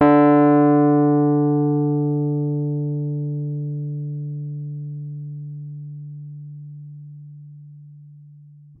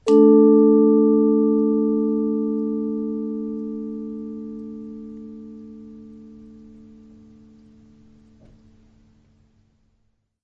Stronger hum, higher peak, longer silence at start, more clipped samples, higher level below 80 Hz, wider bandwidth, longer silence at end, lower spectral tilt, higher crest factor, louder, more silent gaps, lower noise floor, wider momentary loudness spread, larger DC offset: neither; about the same, -4 dBFS vs -4 dBFS; about the same, 0 s vs 0.05 s; neither; second, -66 dBFS vs -60 dBFS; second, 3.5 kHz vs 8.4 kHz; second, 0.45 s vs 4.2 s; first, -13 dB/octave vs -9.5 dB/octave; about the same, 16 dB vs 18 dB; about the same, -19 LUFS vs -18 LUFS; neither; second, -45 dBFS vs -68 dBFS; about the same, 24 LU vs 25 LU; neither